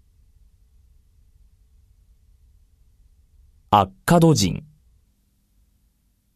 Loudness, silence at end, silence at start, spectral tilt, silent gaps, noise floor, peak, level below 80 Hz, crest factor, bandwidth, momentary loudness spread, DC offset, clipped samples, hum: -19 LUFS; 1.8 s; 3.7 s; -5.5 dB/octave; none; -65 dBFS; -2 dBFS; -48 dBFS; 24 dB; 14 kHz; 8 LU; under 0.1%; under 0.1%; none